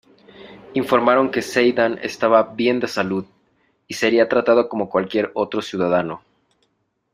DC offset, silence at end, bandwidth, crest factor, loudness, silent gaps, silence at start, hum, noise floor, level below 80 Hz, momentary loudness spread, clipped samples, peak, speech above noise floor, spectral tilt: under 0.1%; 0.95 s; 15 kHz; 18 dB; -19 LUFS; none; 0.4 s; none; -69 dBFS; -62 dBFS; 9 LU; under 0.1%; -2 dBFS; 50 dB; -5 dB/octave